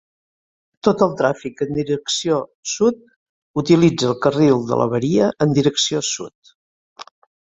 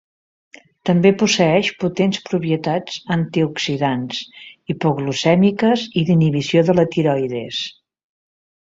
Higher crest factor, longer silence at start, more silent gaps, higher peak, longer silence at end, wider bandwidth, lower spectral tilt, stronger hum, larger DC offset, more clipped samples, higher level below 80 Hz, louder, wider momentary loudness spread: about the same, 18 dB vs 16 dB; about the same, 0.85 s vs 0.85 s; first, 2.55-2.63 s, 3.16-3.54 s, 6.35-6.42 s, 6.55-6.96 s vs none; about the same, -2 dBFS vs -2 dBFS; second, 0.45 s vs 0.95 s; about the same, 8.2 kHz vs 7.8 kHz; about the same, -5 dB/octave vs -6 dB/octave; neither; neither; neither; about the same, -56 dBFS vs -56 dBFS; about the same, -18 LUFS vs -18 LUFS; about the same, 10 LU vs 11 LU